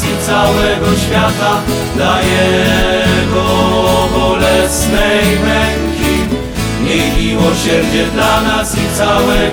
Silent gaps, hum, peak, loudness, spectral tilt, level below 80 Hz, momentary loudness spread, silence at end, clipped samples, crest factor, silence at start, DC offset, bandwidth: none; none; 0 dBFS; -12 LUFS; -4.5 dB/octave; -22 dBFS; 4 LU; 0 s; under 0.1%; 12 dB; 0 s; 0.1%; over 20 kHz